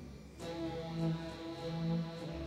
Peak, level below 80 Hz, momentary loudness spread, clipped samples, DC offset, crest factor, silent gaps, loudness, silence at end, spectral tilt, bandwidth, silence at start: -26 dBFS; -56 dBFS; 8 LU; under 0.1%; under 0.1%; 14 dB; none; -40 LUFS; 0 s; -7 dB/octave; 11.5 kHz; 0 s